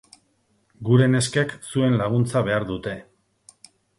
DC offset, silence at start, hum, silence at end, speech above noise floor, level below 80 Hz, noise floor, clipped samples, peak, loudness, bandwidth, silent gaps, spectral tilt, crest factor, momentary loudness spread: under 0.1%; 0.8 s; none; 1 s; 45 dB; -54 dBFS; -66 dBFS; under 0.1%; -4 dBFS; -22 LUFS; 11.5 kHz; none; -6 dB/octave; 18 dB; 14 LU